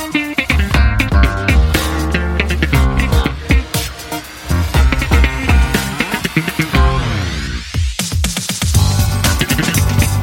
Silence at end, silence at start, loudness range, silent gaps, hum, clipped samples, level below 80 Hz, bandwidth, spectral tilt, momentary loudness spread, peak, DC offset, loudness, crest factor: 0 s; 0 s; 2 LU; none; none; under 0.1%; -18 dBFS; 17 kHz; -4.5 dB/octave; 7 LU; 0 dBFS; under 0.1%; -15 LUFS; 14 dB